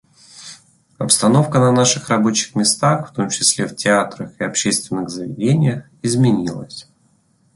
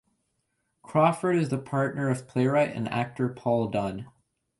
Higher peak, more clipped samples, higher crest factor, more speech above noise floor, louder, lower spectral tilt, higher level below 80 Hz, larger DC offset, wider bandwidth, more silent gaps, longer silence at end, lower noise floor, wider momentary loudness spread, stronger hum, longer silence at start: first, 0 dBFS vs -8 dBFS; neither; about the same, 18 dB vs 18 dB; second, 42 dB vs 50 dB; first, -17 LUFS vs -27 LUFS; second, -4 dB/octave vs -7.5 dB/octave; first, -56 dBFS vs -62 dBFS; neither; about the same, 11.5 kHz vs 11.5 kHz; neither; first, 0.75 s vs 0.5 s; second, -59 dBFS vs -76 dBFS; first, 16 LU vs 7 LU; neither; second, 0.35 s vs 0.85 s